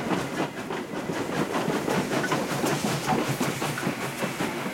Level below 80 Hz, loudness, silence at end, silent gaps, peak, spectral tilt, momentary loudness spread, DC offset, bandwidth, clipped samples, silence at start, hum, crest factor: -60 dBFS; -28 LUFS; 0 s; none; -14 dBFS; -4.5 dB/octave; 5 LU; under 0.1%; 16.5 kHz; under 0.1%; 0 s; none; 14 dB